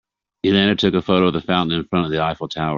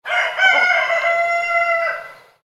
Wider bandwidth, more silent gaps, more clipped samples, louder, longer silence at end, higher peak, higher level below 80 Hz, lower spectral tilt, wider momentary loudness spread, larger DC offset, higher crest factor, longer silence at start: second, 7.2 kHz vs 13 kHz; neither; neither; about the same, -18 LUFS vs -16 LUFS; second, 0 s vs 0.3 s; about the same, -2 dBFS vs -2 dBFS; first, -50 dBFS vs -72 dBFS; first, -4 dB/octave vs 0.5 dB/octave; about the same, 7 LU vs 7 LU; neither; about the same, 18 dB vs 16 dB; first, 0.45 s vs 0.05 s